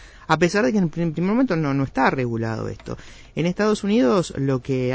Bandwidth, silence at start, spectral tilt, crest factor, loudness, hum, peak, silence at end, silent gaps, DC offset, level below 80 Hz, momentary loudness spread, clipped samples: 8 kHz; 0 s; -6.5 dB/octave; 18 dB; -21 LUFS; none; -4 dBFS; 0 s; none; under 0.1%; -48 dBFS; 12 LU; under 0.1%